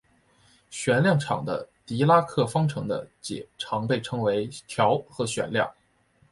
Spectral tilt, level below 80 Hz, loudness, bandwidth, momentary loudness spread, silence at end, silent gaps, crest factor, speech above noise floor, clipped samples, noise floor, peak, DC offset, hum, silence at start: -5.5 dB/octave; -62 dBFS; -26 LUFS; 11.5 kHz; 13 LU; 0.6 s; none; 20 dB; 39 dB; under 0.1%; -64 dBFS; -6 dBFS; under 0.1%; none; 0.7 s